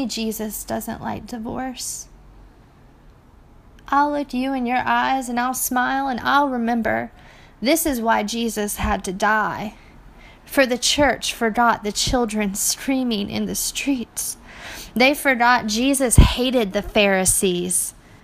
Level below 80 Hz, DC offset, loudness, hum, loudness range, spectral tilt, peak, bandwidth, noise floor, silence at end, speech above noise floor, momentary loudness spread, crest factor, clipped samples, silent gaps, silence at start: -32 dBFS; under 0.1%; -20 LUFS; none; 9 LU; -3.5 dB/octave; 0 dBFS; 15.5 kHz; -49 dBFS; 0.1 s; 29 dB; 12 LU; 22 dB; under 0.1%; none; 0 s